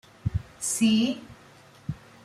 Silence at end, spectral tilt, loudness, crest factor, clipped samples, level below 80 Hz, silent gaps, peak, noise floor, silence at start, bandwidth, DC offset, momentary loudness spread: 0.3 s; -4 dB/octave; -26 LUFS; 16 dB; under 0.1%; -48 dBFS; none; -12 dBFS; -53 dBFS; 0.25 s; 14.5 kHz; under 0.1%; 16 LU